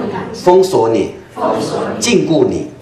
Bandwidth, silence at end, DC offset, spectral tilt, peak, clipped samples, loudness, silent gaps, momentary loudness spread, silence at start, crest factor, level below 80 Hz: 13.5 kHz; 0 s; under 0.1%; -5 dB/octave; 0 dBFS; under 0.1%; -14 LUFS; none; 9 LU; 0 s; 14 dB; -48 dBFS